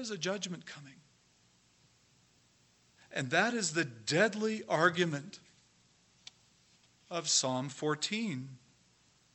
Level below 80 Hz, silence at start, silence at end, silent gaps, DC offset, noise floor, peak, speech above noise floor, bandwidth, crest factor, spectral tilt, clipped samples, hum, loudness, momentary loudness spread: -82 dBFS; 0 s; 0.8 s; none; under 0.1%; -68 dBFS; -12 dBFS; 35 dB; 8.6 kHz; 24 dB; -3 dB/octave; under 0.1%; 60 Hz at -70 dBFS; -32 LUFS; 22 LU